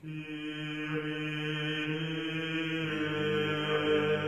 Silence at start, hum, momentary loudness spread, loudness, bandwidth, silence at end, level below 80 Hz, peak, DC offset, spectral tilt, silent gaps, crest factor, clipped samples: 0 s; none; 9 LU; -33 LUFS; 13.5 kHz; 0 s; -70 dBFS; -18 dBFS; under 0.1%; -6 dB/octave; none; 16 dB; under 0.1%